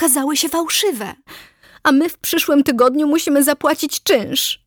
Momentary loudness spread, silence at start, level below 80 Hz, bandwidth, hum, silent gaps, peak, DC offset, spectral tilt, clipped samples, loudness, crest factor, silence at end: 5 LU; 0 s; -58 dBFS; over 20 kHz; none; none; -2 dBFS; under 0.1%; -2 dB/octave; under 0.1%; -16 LUFS; 14 dB; 0.1 s